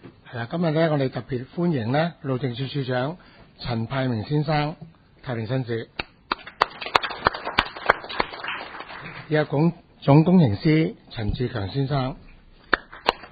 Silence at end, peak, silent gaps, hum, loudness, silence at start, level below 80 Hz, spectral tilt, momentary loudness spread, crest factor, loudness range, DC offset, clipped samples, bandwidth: 0.05 s; 0 dBFS; none; none; -24 LUFS; 0.05 s; -46 dBFS; -8 dB/octave; 14 LU; 24 dB; 6 LU; under 0.1%; under 0.1%; 8 kHz